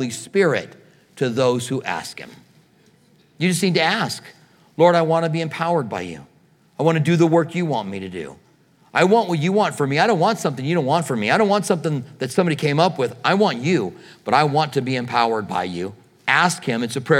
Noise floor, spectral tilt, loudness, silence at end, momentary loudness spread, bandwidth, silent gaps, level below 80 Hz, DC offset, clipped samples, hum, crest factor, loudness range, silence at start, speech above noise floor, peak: -56 dBFS; -5.5 dB/octave; -20 LUFS; 0 s; 13 LU; 16 kHz; none; -68 dBFS; under 0.1%; under 0.1%; none; 20 dB; 4 LU; 0 s; 36 dB; 0 dBFS